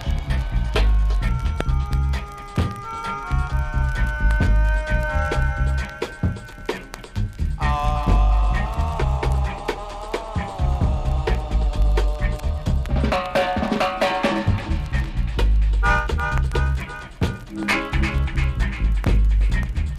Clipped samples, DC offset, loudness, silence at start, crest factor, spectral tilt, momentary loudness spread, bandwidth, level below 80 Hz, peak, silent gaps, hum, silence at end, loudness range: under 0.1%; under 0.1%; -23 LUFS; 0 s; 16 dB; -6.5 dB/octave; 8 LU; 11 kHz; -22 dBFS; -4 dBFS; none; none; 0 s; 2 LU